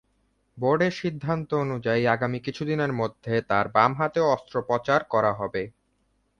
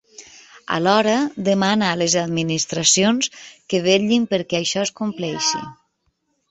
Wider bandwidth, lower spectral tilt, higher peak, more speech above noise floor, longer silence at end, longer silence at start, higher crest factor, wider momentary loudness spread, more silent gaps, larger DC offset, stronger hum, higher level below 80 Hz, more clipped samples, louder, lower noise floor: first, 9.6 kHz vs 8.4 kHz; first, -7 dB/octave vs -3.5 dB/octave; about the same, -4 dBFS vs -2 dBFS; second, 45 dB vs 50 dB; about the same, 0.7 s vs 0.75 s; first, 0.55 s vs 0.2 s; about the same, 22 dB vs 20 dB; about the same, 8 LU vs 9 LU; neither; neither; neither; about the same, -58 dBFS vs -60 dBFS; neither; second, -25 LUFS vs -19 LUFS; about the same, -70 dBFS vs -69 dBFS